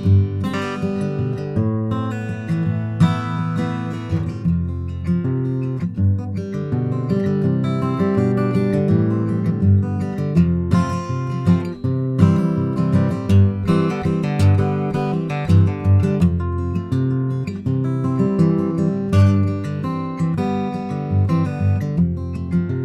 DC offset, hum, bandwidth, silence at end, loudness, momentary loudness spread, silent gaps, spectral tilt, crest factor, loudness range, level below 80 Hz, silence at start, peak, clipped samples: under 0.1%; none; 9.4 kHz; 0 s; -20 LUFS; 7 LU; none; -9 dB/octave; 18 dB; 4 LU; -42 dBFS; 0 s; 0 dBFS; under 0.1%